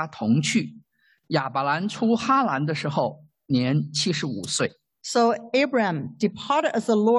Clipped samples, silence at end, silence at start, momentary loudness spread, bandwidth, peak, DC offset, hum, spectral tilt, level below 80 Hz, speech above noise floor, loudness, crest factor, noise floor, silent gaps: under 0.1%; 0 s; 0 s; 6 LU; 12 kHz; -8 dBFS; under 0.1%; none; -5 dB/octave; -66 dBFS; 40 dB; -24 LUFS; 16 dB; -63 dBFS; none